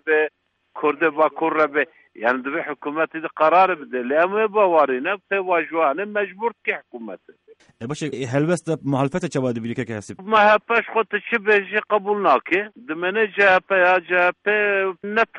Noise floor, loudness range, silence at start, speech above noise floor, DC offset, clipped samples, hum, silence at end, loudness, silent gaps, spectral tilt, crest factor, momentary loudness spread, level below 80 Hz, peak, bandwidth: -41 dBFS; 6 LU; 0.05 s; 20 dB; under 0.1%; under 0.1%; none; 0 s; -20 LUFS; none; -5.5 dB/octave; 16 dB; 11 LU; -64 dBFS; -4 dBFS; 11 kHz